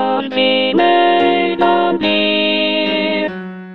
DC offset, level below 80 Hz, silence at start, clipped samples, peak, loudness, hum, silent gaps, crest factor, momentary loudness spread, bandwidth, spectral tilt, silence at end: 0.9%; -56 dBFS; 0 s; under 0.1%; 0 dBFS; -14 LUFS; none; none; 14 dB; 6 LU; 5.8 kHz; -7 dB/octave; 0 s